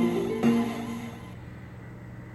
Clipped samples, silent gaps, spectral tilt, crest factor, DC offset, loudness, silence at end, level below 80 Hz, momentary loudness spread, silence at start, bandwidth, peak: under 0.1%; none; -7 dB/octave; 16 dB; under 0.1%; -28 LUFS; 0 s; -54 dBFS; 19 LU; 0 s; 12.5 kHz; -12 dBFS